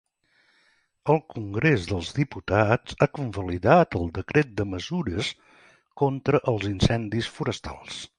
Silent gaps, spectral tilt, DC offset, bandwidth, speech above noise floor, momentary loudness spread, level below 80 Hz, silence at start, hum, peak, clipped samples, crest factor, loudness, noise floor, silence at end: none; -6.5 dB/octave; under 0.1%; 11 kHz; 41 dB; 11 LU; -44 dBFS; 1.05 s; none; -4 dBFS; under 0.1%; 22 dB; -25 LUFS; -66 dBFS; 0.1 s